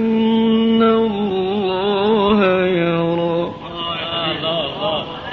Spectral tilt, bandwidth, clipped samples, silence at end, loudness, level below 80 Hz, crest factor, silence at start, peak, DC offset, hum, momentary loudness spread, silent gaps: -4 dB/octave; 5.8 kHz; under 0.1%; 0 s; -17 LUFS; -48 dBFS; 14 dB; 0 s; -4 dBFS; under 0.1%; none; 8 LU; none